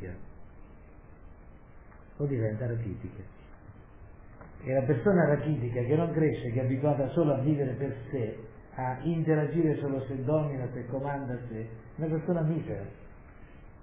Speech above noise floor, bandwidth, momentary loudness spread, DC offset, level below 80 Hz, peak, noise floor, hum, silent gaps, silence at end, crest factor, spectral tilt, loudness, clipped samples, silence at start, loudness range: 22 dB; 3.8 kHz; 17 LU; under 0.1%; -54 dBFS; -14 dBFS; -51 dBFS; none; none; 0.05 s; 18 dB; -9 dB/octave; -30 LUFS; under 0.1%; 0 s; 10 LU